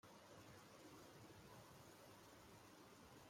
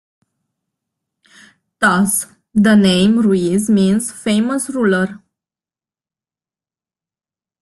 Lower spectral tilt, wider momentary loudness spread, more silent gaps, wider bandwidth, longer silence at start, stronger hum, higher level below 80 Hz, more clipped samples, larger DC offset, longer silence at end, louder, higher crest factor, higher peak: about the same, -4 dB/octave vs -5 dB/octave; second, 2 LU vs 8 LU; neither; first, 16.5 kHz vs 12.5 kHz; second, 0.05 s vs 1.8 s; neither; second, -82 dBFS vs -54 dBFS; neither; neither; second, 0 s vs 2.45 s; second, -63 LUFS vs -15 LUFS; about the same, 14 dB vs 16 dB; second, -50 dBFS vs 0 dBFS